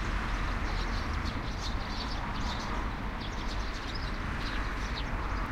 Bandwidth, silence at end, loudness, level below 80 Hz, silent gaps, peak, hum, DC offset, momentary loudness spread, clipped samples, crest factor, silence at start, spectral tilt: 11.5 kHz; 0 s; -35 LUFS; -36 dBFS; none; -20 dBFS; none; under 0.1%; 3 LU; under 0.1%; 14 dB; 0 s; -5 dB/octave